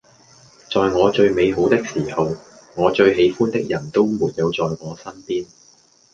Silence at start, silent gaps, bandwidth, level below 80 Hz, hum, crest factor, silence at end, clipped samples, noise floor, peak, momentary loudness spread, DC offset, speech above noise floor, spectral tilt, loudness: 0.7 s; none; 7.6 kHz; -50 dBFS; none; 18 dB; 0.7 s; under 0.1%; -53 dBFS; -2 dBFS; 15 LU; under 0.1%; 35 dB; -6 dB/octave; -19 LUFS